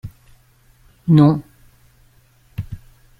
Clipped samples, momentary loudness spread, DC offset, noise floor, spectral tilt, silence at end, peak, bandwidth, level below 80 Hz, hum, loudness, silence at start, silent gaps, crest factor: under 0.1%; 25 LU; under 0.1%; -53 dBFS; -10 dB/octave; 0.45 s; -2 dBFS; 5 kHz; -46 dBFS; none; -15 LUFS; 0.05 s; none; 18 dB